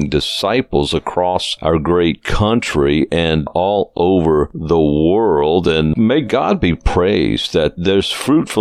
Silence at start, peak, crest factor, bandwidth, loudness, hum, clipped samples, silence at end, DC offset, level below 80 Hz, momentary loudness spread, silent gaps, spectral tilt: 0 s; 0 dBFS; 14 dB; 14.5 kHz; -15 LUFS; none; under 0.1%; 0 s; under 0.1%; -30 dBFS; 3 LU; none; -6 dB/octave